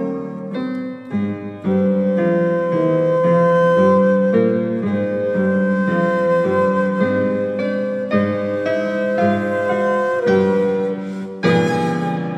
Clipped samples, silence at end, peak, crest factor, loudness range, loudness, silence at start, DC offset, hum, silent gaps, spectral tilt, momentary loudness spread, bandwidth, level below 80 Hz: under 0.1%; 0 s; -4 dBFS; 14 dB; 3 LU; -18 LUFS; 0 s; under 0.1%; none; none; -8 dB/octave; 10 LU; 8.6 kHz; -66 dBFS